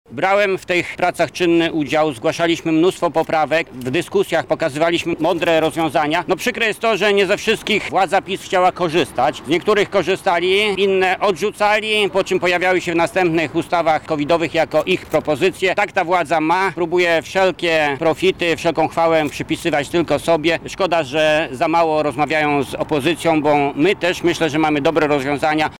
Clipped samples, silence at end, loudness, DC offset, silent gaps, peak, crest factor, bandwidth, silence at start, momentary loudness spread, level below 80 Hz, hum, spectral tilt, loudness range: under 0.1%; 0.05 s; -17 LUFS; 0.2%; none; -6 dBFS; 10 dB; 17 kHz; 0.1 s; 3 LU; -50 dBFS; none; -4.5 dB/octave; 1 LU